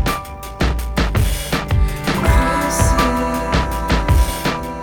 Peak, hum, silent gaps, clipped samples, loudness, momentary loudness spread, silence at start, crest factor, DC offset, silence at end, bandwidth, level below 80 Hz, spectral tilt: 0 dBFS; none; none; under 0.1%; -18 LUFS; 6 LU; 0 s; 16 dB; under 0.1%; 0 s; 18.5 kHz; -20 dBFS; -5 dB/octave